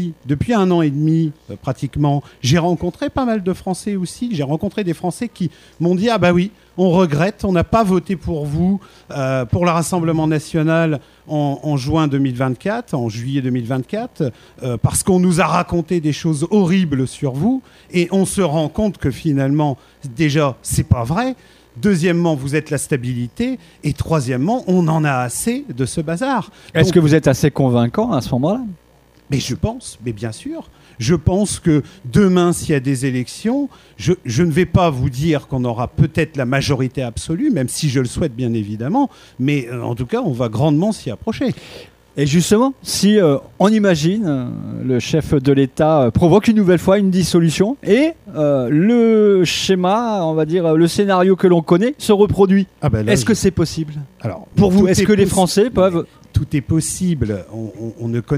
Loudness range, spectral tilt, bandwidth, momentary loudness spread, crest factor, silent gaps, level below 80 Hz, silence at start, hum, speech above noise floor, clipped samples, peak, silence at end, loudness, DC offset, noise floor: 5 LU; -6 dB/octave; 15.5 kHz; 10 LU; 16 dB; none; -40 dBFS; 0 s; none; 34 dB; under 0.1%; 0 dBFS; 0 s; -17 LUFS; under 0.1%; -50 dBFS